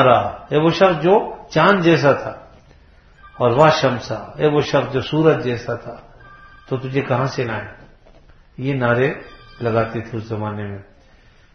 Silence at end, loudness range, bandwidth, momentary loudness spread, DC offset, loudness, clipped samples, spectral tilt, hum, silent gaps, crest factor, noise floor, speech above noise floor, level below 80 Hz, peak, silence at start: 0.75 s; 6 LU; 7.4 kHz; 15 LU; under 0.1%; -18 LUFS; under 0.1%; -6.5 dB/octave; none; none; 18 dB; -49 dBFS; 32 dB; -48 dBFS; 0 dBFS; 0 s